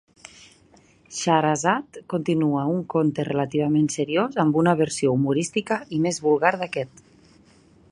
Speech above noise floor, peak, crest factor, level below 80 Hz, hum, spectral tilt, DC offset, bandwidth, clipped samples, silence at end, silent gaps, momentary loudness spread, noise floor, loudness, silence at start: 33 dB; -2 dBFS; 20 dB; -62 dBFS; none; -5.5 dB/octave; under 0.1%; 11 kHz; under 0.1%; 1.05 s; none; 8 LU; -55 dBFS; -23 LUFS; 1.1 s